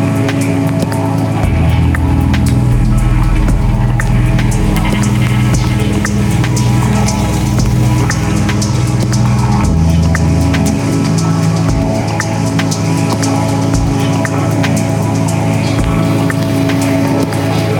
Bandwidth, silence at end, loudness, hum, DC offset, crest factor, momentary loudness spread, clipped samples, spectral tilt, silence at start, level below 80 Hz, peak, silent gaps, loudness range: 18 kHz; 0 s; -12 LUFS; none; under 0.1%; 10 dB; 2 LU; under 0.1%; -6 dB/octave; 0 s; -20 dBFS; -2 dBFS; none; 1 LU